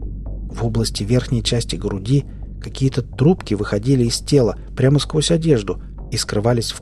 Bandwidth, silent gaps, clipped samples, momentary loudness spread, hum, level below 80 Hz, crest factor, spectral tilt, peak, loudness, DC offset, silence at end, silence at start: 13 kHz; none; under 0.1%; 13 LU; none; -32 dBFS; 16 dB; -6 dB/octave; -2 dBFS; -19 LUFS; under 0.1%; 0 s; 0 s